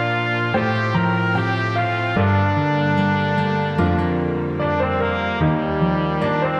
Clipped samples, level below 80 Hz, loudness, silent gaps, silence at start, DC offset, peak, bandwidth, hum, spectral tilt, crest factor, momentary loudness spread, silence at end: under 0.1%; -40 dBFS; -20 LUFS; none; 0 s; under 0.1%; -6 dBFS; 8 kHz; none; -8 dB/octave; 14 dB; 2 LU; 0 s